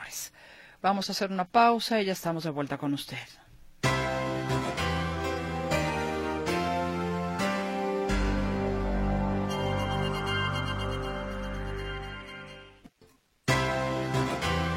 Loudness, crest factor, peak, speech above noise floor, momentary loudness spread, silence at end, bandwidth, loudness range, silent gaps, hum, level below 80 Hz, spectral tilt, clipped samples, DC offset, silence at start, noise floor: -30 LUFS; 20 dB; -10 dBFS; 34 dB; 10 LU; 0 s; 16.5 kHz; 5 LU; none; none; -40 dBFS; -5 dB/octave; under 0.1%; under 0.1%; 0 s; -62 dBFS